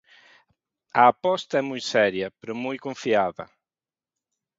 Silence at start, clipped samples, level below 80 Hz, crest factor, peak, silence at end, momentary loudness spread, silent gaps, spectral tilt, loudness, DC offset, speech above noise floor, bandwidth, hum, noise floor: 0.95 s; under 0.1%; -68 dBFS; 22 dB; -4 dBFS; 1.15 s; 13 LU; none; -4.5 dB/octave; -24 LUFS; under 0.1%; over 67 dB; 7.8 kHz; none; under -90 dBFS